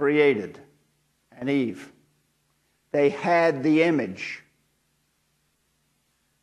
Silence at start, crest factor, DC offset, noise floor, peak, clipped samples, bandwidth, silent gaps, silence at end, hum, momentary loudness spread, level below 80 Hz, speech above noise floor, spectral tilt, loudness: 0 s; 20 dB; under 0.1%; -70 dBFS; -6 dBFS; under 0.1%; 11 kHz; none; 2.05 s; none; 15 LU; -74 dBFS; 48 dB; -6.5 dB/octave; -23 LUFS